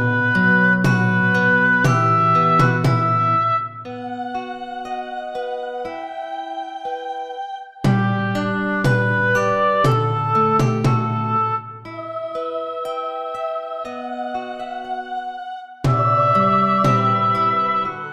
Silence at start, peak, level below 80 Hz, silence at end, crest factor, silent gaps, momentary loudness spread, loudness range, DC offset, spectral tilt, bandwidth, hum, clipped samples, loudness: 0 s; -2 dBFS; -46 dBFS; 0 s; 16 dB; none; 14 LU; 11 LU; under 0.1%; -7 dB/octave; 12 kHz; none; under 0.1%; -19 LUFS